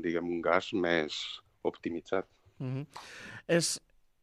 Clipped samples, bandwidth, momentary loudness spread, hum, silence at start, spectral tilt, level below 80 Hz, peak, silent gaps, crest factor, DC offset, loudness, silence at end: under 0.1%; 15 kHz; 16 LU; none; 0 s; -4 dB/octave; -70 dBFS; -10 dBFS; none; 24 dB; under 0.1%; -33 LUFS; 0.45 s